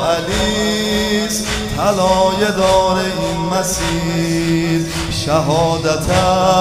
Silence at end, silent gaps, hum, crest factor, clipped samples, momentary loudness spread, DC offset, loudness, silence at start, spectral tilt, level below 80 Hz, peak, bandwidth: 0 s; none; none; 14 dB; under 0.1%; 5 LU; under 0.1%; -16 LUFS; 0 s; -4.5 dB/octave; -32 dBFS; -2 dBFS; 16 kHz